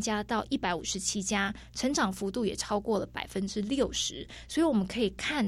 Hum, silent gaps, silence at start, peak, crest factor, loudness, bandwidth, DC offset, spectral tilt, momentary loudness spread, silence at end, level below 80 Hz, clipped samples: none; none; 0 s; -14 dBFS; 16 dB; -31 LUFS; 15.5 kHz; under 0.1%; -3.5 dB/octave; 6 LU; 0 s; -52 dBFS; under 0.1%